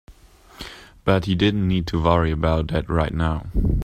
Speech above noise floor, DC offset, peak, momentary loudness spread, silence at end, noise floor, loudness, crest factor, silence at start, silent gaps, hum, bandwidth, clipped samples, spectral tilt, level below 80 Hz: 28 dB; under 0.1%; -2 dBFS; 17 LU; 0 s; -48 dBFS; -21 LUFS; 20 dB; 0.1 s; none; none; 9.6 kHz; under 0.1%; -7.5 dB/octave; -30 dBFS